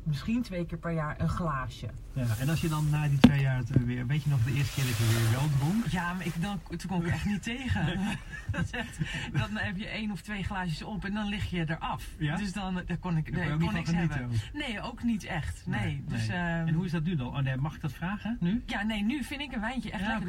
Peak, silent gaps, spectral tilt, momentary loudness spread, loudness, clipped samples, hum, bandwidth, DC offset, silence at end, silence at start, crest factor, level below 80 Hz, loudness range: -2 dBFS; none; -6 dB/octave; 7 LU; -31 LUFS; under 0.1%; none; 17 kHz; under 0.1%; 0 s; 0 s; 28 dB; -44 dBFS; 6 LU